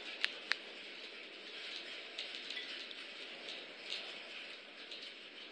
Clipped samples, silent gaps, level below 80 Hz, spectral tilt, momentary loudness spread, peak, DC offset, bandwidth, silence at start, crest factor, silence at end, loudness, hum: under 0.1%; none; under -90 dBFS; 0 dB/octave; 9 LU; -10 dBFS; under 0.1%; 11 kHz; 0 s; 36 dB; 0 s; -44 LUFS; none